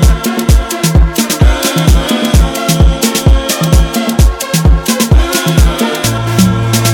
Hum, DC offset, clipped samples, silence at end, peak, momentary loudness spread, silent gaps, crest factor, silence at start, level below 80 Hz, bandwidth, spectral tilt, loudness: none; under 0.1%; 0.1%; 0 s; 0 dBFS; 2 LU; none; 8 dB; 0 s; -12 dBFS; 18 kHz; -5 dB/octave; -10 LUFS